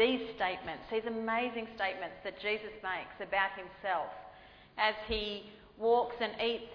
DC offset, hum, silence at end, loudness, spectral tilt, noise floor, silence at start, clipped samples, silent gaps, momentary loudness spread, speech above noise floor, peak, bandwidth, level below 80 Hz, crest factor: under 0.1%; none; 0 s; -35 LUFS; -6 dB/octave; -56 dBFS; 0 s; under 0.1%; none; 11 LU; 21 dB; -14 dBFS; 5.4 kHz; -58 dBFS; 20 dB